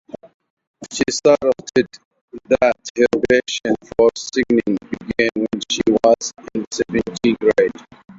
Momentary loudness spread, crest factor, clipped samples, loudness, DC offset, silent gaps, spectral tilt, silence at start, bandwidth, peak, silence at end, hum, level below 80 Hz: 10 LU; 16 dB; under 0.1%; -18 LUFS; under 0.1%; 2.05-2.11 s, 2.21-2.28 s, 2.90-2.95 s, 6.67-6.71 s; -4 dB/octave; 0.8 s; 8 kHz; -2 dBFS; 0.05 s; none; -50 dBFS